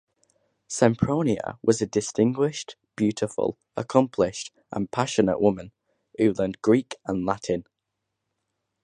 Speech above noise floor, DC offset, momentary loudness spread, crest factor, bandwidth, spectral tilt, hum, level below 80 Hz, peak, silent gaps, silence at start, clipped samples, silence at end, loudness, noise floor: 58 dB; under 0.1%; 12 LU; 22 dB; 11 kHz; -6 dB/octave; none; -56 dBFS; -2 dBFS; none; 0.7 s; under 0.1%; 1.2 s; -25 LUFS; -82 dBFS